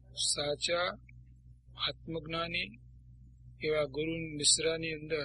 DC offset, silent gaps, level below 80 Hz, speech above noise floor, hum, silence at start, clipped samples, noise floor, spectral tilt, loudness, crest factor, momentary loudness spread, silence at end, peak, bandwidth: under 0.1%; none; -56 dBFS; 23 dB; none; 0.1 s; under 0.1%; -56 dBFS; -2 dB/octave; -32 LUFS; 22 dB; 12 LU; 0 s; -14 dBFS; 11 kHz